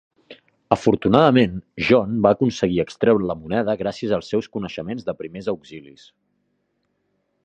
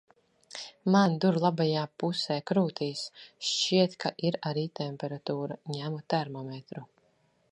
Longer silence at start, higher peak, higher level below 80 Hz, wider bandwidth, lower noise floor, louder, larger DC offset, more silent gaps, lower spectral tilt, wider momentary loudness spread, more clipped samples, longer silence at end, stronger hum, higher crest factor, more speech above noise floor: second, 0.3 s vs 0.55 s; first, 0 dBFS vs -10 dBFS; first, -50 dBFS vs -76 dBFS; second, 8.8 kHz vs 10.5 kHz; about the same, -71 dBFS vs -69 dBFS; first, -20 LUFS vs -29 LUFS; neither; neither; first, -7 dB/octave vs -5.5 dB/octave; second, 13 LU vs 16 LU; neither; first, 1.65 s vs 0.65 s; neither; about the same, 20 dB vs 20 dB; first, 51 dB vs 40 dB